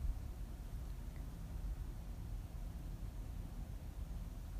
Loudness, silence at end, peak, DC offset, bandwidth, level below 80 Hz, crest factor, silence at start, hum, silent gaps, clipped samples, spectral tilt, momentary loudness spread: -49 LUFS; 0 s; -28 dBFS; under 0.1%; 15.5 kHz; -46 dBFS; 16 dB; 0 s; none; none; under 0.1%; -6.5 dB/octave; 2 LU